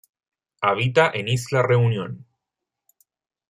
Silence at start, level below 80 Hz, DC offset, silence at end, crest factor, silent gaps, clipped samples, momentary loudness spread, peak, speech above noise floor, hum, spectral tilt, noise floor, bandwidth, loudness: 0.6 s; -62 dBFS; under 0.1%; 1.3 s; 20 dB; none; under 0.1%; 12 LU; -4 dBFS; 64 dB; none; -5.5 dB/octave; -84 dBFS; 13 kHz; -21 LUFS